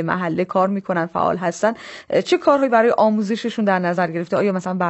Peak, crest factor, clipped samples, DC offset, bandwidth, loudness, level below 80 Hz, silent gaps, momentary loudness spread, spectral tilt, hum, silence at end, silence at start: -2 dBFS; 16 dB; under 0.1%; under 0.1%; 8.4 kHz; -19 LUFS; -64 dBFS; none; 7 LU; -6 dB/octave; none; 0 s; 0 s